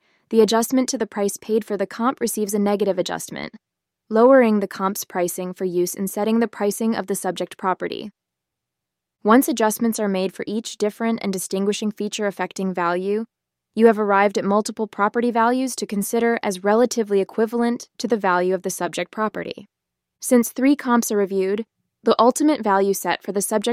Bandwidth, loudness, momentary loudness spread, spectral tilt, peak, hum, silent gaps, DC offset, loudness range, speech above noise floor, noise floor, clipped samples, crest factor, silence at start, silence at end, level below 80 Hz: 16 kHz; -21 LUFS; 10 LU; -4.5 dB/octave; -2 dBFS; none; none; under 0.1%; 4 LU; 63 dB; -84 dBFS; under 0.1%; 18 dB; 0.3 s; 0 s; -68 dBFS